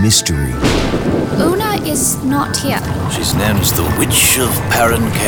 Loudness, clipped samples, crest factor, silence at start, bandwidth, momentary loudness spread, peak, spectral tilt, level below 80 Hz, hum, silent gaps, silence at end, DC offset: -14 LUFS; under 0.1%; 14 dB; 0 s; over 20 kHz; 6 LU; 0 dBFS; -4 dB/octave; -28 dBFS; none; none; 0 s; under 0.1%